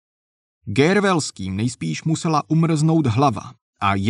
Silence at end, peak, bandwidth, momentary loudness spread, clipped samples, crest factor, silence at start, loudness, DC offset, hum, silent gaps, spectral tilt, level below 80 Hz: 0 s; -4 dBFS; 11 kHz; 8 LU; under 0.1%; 16 dB; 0.65 s; -20 LUFS; under 0.1%; none; 3.61-3.73 s; -6 dB/octave; -56 dBFS